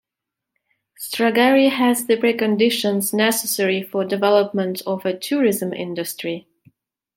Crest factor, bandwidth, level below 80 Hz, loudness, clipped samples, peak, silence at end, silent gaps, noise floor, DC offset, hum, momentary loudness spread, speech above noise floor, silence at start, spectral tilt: 18 dB; 17 kHz; -70 dBFS; -19 LUFS; under 0.1%; -2 dBFS; 0.75 s; none; -84 dBFS; under 0.1%; none; 11 LU; 65 dB; 1 s; -4 dB/octave